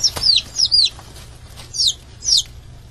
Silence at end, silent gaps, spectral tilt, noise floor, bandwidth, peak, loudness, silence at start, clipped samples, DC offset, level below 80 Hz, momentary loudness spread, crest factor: 0.05 s; none; 0.5 dB/octave; -38 dBFS; 13.5 kHz; -2 dBFS; -15 LUFS; 0 s; under 0.1%; under 0.1%; -42 dBFS; 12 LU; 18 dB